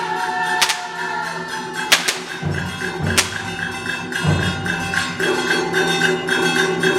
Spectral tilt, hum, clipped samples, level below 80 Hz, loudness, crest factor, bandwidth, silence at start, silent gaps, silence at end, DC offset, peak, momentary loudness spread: -3 dB/octave; none; under 0.1%; -48 dBFS; -19 LUFS; 20 dB; 16.5 kHz; 0 s; none; 0 s; under 0.1%; 0 dBFS; 8 LU